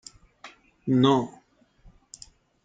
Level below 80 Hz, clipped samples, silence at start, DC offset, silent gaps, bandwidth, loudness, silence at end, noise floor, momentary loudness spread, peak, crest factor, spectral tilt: -60 dBFS; under 0.1%; 0.45 s; under 0.1%; none; 9.2 kHz; -24 LUFS; 1.35 s; -57 dBFS; 27 LU; -8 dBFS; 22 dB; -6.5 dB/octave